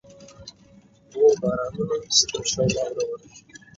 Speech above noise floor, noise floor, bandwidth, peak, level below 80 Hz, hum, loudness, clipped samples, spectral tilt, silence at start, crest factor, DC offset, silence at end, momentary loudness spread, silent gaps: 28 dB; -53 dBFS; 7.8 kHz; -4 dBFS; -54 dBFS; none; -22 LUFS; under 0.1%; -3 dB/octave; 0.1 s; 20 dB; under 0.1%; 0.2 s; 24 LU; none